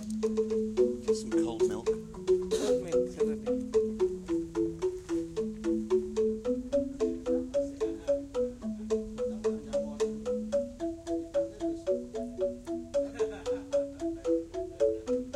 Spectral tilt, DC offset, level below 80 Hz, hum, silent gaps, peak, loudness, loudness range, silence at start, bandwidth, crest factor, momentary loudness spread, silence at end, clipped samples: -6 dB/octave; under 0.1%; -54 dBFS; none; none; -16 dBFS; -32 LUFS; 4 LU; 0 s; 13 kHz; 16 dB; 6 LU; 0 s; under 0.1%